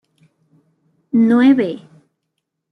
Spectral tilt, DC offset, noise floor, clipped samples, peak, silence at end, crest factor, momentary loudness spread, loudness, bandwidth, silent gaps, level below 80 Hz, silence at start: -8 dB/octave; under 0.1%; -75 dBFS; under 0.1%; -2 dBFS; 0.95 s; 16 dB; 13 LU; -14 LUFS; 4.9 kHz; none; -68 dBFS; 1.15 s